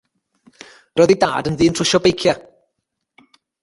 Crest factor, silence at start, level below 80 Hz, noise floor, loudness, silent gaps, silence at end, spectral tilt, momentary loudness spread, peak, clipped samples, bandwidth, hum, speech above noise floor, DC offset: 18 dB; 0.95 s; -48 dBFS; -76 dBFS; -16 LUFS; none; 1.25 s; -4.5 dB/octave; 7 LU; 0 dBFS; under 0.1%; 11.5 kHz; none; 60 dB; under 0.1%